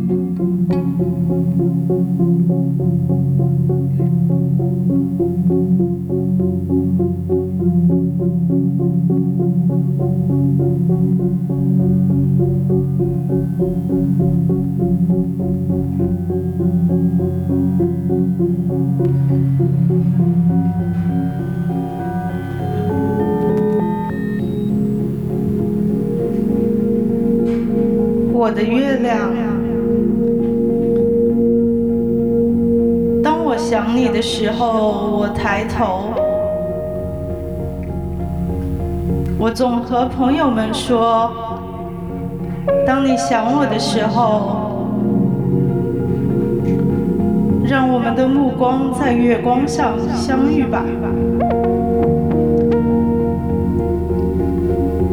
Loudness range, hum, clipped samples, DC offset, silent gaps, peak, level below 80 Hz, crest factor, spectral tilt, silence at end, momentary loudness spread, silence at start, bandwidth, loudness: 3 LU; none; under 0.1%; under 0.1%; none; -2 dBFS; -34 dBFS; 14 dB; -8 dB/octave; 0 s; 5 LU; 0 s; 11.5 kHz; -17 LUFS